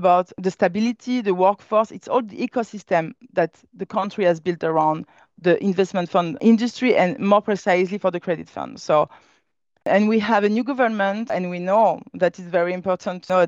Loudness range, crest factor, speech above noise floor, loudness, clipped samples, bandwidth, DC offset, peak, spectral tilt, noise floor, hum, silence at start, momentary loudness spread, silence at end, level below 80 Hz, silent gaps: 3 LU; 16 dB; 48 dB; -21 LUFS; under 0.1%; 7.8 kHz; under 0.1%; -4 dBFS; -6.5 dB/octave; -68 dBFS; none; 0 s; 8 LU; 0 s; -68 dBFS; none